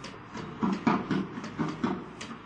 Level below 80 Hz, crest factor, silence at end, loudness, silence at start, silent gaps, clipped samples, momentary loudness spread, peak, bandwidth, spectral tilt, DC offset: -60 dBFS; 20 dB; 0 s; -32 LUFS; 0 s; none; under 0.1%; 13 LU; -12 dBFS; 9.6 kHz; -6.5 dB/octave; under 0.1%